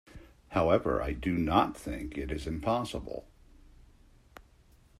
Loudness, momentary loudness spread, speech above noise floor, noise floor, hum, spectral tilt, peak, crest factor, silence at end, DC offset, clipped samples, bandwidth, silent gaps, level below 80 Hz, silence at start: -31 LUFS; 12 LU; 31 dB; -61 dBFS; none; -6.5 dB/octave; -10 dBFS; 24 dB; 1.75 s; under 0.1%; under 0.1%; 14.5 kHz; none; -46 dBFS; 0.15 s